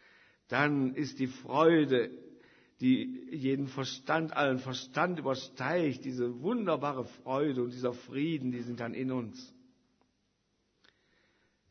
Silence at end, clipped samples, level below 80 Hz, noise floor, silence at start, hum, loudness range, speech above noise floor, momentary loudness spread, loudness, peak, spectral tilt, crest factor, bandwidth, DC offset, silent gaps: 2.25 s; under 0.1%; -78 dBFS; -77 dBFS; 0.5 s; none; 8 LU; 45 dB; 10 LU; -32 LUFS; -12 dBFS; -6 dB/octave; 20 dB; 6.6 kHz; under 0.1%; none